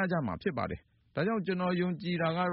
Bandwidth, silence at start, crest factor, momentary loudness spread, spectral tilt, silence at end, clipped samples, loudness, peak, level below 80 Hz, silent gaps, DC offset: 5.6 kHz; 0 s; 14 dB; 8 LU; -5.5 dB/octave; 0 s; under 0.1%; -33 LUFS; -18 dBFS; -60 dBFS; none; under 0.1%